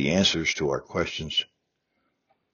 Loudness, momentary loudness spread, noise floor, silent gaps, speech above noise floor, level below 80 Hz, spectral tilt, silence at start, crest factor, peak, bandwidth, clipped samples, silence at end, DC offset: -25 LUFS; 8 LU; -76 dBFS; none; 50 dB; -52 dBFS; -3 dB/octave; 0 s; 20 dB; -8 dBFS; 7 kHz; under 0.1%; 1.1 s; under 0.1%